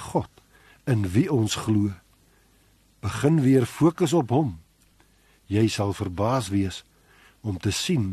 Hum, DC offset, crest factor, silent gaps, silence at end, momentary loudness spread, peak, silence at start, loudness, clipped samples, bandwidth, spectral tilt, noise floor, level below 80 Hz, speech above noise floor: none; under 0.1%; 18 dB; none; 0 s; 15 LU; -8 dBFS; 0 s; -24 LUFS; under 0.1%; 13 kHz; -6 dB/octave; -60 dBFS; -54 dBFS; 37 dB